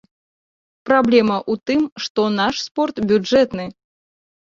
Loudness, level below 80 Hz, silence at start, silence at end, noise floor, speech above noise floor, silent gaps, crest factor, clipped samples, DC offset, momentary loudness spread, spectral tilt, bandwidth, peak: -18 LUFS; -56 dBFS; 0.85 s; 0.8 s; under -90 dBFS; over 73 dB; 1.92-1.96 s, 2.10-2.15 s, 2.71-2.75 s; 18 dB; under 0.1%; under 0.1%; 8 LU; -5 dB/octave; 7.6 kHz; 0 dBFS